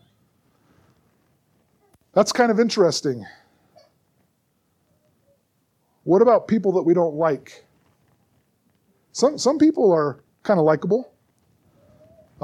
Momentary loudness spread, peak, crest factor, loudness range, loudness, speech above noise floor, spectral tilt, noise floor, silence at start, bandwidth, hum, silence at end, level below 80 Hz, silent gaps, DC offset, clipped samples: 13 LU; -4 dBFS; 18 dB; 3 LU; -20 LUFS; 50 dB; -5.5 dB/octave; -68 dBFS; 2.15 s; 13.5 kHz; none; 1.4 s; -68 dBFS; none; under 0.1%; under 0.1%